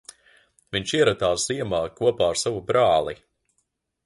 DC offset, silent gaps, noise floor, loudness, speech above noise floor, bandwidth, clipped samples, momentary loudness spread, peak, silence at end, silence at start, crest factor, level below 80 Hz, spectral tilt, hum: under 0.1%; none; -74 dBFS; -23 LUFS; 52 dB; 11.5 kHz; under 0.1%; 9 LU; -6 dBFS; 0.9 s; 0.7 s; 18 dB; -52 dBFS; -3.5 dB/octave; none